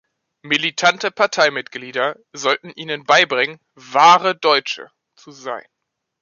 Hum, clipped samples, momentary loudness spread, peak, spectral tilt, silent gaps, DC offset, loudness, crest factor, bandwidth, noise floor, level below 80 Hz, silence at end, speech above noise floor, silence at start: none; under 0.1%; 17 LU; -2 dBFS; -2 dB/octave; none; under 0.1%; -17 LUFS; 18 dB; 7.4 kHz; -78 dBFS; -72 dBFS; 0.6 s; 60 dB; 0.45 s